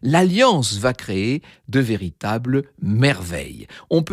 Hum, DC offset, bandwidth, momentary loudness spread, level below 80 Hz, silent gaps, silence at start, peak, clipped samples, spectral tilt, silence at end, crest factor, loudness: none; under 0.1%; 15 kHz; 12 LU; -48 dBFS; none; 0.05 s; -4 dBFS; under 0.1%; -5.5 dB/octave; 0 s; 16 dB; -20 LUFS